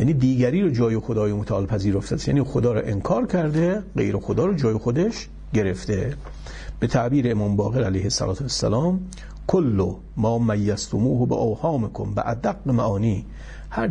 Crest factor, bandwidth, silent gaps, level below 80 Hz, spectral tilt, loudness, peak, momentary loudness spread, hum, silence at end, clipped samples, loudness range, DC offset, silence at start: 16 dB; 10.5 kHz; none; -40 dBFS; -7 dB/octave; -23 LUFS; -6 dBFS; 7 LU; none; 0 s; under 0.1%; 2 LU; under 0.1%; 0 s